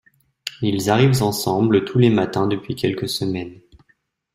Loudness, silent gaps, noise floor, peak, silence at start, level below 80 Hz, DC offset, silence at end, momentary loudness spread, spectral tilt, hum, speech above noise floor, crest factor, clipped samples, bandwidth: -19 LUFS; none; -64 dBFS; -2 dBFS; 0.45 s; -52 dBFS; under 0.1%; 0.8 s; 12 LU; -6 dB/octave; none; 46 dB; 18 dB; under 0.1%; 16 kHz